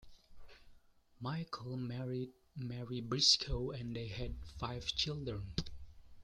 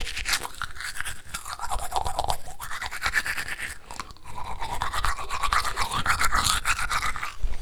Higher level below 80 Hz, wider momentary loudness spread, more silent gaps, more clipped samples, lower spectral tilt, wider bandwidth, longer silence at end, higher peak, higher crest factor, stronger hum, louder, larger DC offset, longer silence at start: second, -52 dBFS vs -36 dBFS; first, 16 LU vs 13 LU; neither; neither; first, -4 dB/octave vs -1.5 dB/octave; second, 12 kHz vs 19.5 kHz; about the same, 0 s vs 0 s; second, -14 dBFS vs -2 dBFS; about the same, 26 dB vs 24 dB; neither; second, -38 LUFS vs -28 LUFS; neither; about the same, 0 s vs 0 s